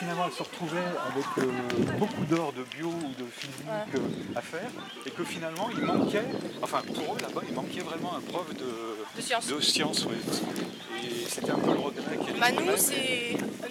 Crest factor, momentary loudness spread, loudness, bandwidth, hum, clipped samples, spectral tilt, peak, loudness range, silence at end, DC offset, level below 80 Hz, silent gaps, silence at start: 22 dB; 11 LU; -30 LUFS; 18 kHz; none; under 0.1%; -3.5 dB/octave; -8 dBFS; 5 LU; 0 s; under 0.1%; -72 dBFS; none; 0 s